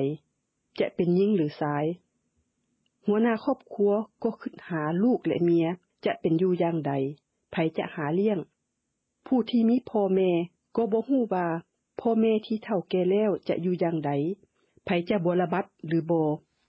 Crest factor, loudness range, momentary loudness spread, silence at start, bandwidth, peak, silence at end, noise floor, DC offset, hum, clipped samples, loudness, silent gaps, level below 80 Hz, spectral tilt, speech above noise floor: 14 dB; 2 LU; 9 LU; 0 s; 5.8 kHz; -12 dBFS; 0.3 s; -80 dBFS; under 0.1%; none; under 0.1%; -27 LUFS; none; -68 dBFS; -10 dB/octave; 54 dB